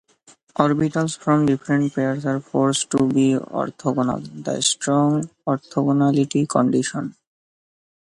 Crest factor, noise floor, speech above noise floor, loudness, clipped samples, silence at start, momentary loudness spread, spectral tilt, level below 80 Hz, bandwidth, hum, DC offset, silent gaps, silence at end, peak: 20 dB; -54 dBFS; 34 dB; -21 LUFS; under 0.1%; 0.6 s; 8 LU; -5 dB/octave; -58 dBFS; 11.5 kHz; none; under 0.1%; none; 1 s; 0 dBFS